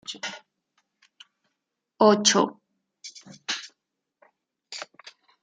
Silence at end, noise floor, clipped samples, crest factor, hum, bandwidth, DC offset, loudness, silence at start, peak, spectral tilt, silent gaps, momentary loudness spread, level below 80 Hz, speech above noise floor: 0.6 s; -82 dBFS; under 0.1%; 24 dB; none; 9.6 kHz; under 0.1%; -23 LUFS; 0.1 s; -4 dBFS; -2.5 dB/octave; none; 25 LU; -80 dBFS; 60 dB